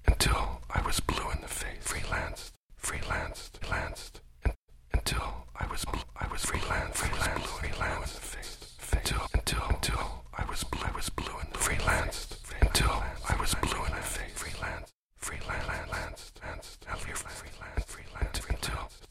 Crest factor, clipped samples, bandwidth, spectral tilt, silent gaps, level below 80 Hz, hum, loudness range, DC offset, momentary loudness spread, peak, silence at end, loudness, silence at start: 22 dB; under 0.1%; 16.5 kHz; -3 dB/octave; 2.57-2.69 s, 4.56-4.68 s, 14.94-15.09 s; -36 dBFS; none; 7 LU; under 0.1%; 13 LU; -10 dBFS; 0.05 s; -34 LUFS; 0 s